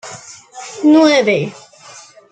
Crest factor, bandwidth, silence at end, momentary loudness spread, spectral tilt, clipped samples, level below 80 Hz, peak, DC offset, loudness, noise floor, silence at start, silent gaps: 14 dB; 9 kHz; 0.8 s; 23 LU; -4.5 dB/octave; under 0.1%; -62 dBFS; -2 dBFS; under 0.1%; -12 LUFS; -40 dBFS; 0.05 s; none